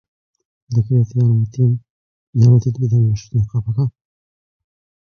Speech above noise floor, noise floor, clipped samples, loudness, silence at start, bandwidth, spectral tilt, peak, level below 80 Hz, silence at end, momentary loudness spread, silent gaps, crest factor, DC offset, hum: over 75 dB; under -90 dBFS; under 0.1%; -17 LUFS; 0.7 s; 6.6 kHz; -9.5 dB/octave; -2 dBFS; -44 dBFS; 1.25 s; 9 LU; 1.90-2.33 s; 16 dB; under 0.1%; none